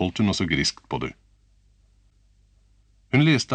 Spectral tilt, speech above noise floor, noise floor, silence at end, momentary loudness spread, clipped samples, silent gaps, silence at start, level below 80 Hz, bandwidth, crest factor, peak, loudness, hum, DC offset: -5 dB/octave; 37 dB; -60 dBFS; 0 s; 12 LU; under 0.1%; none; 0 s; -50 dBFS; 9.4 kHz; 20 dB; -6 dBFS; -23 LUFS; none; under 0.1%